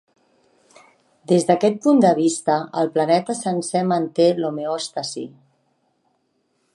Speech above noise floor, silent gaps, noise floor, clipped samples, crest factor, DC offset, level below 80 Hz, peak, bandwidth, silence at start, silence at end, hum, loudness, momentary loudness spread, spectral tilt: 49 dB; none; -68 dBFS; under 0.1%; 18 dB; under 0.1%; -74 dBFS; -4 dBFS; 11.5 kHz; 1.3 s; 1.45 s; none; -20 LUFS; 11 LU; -5.5 dB/octave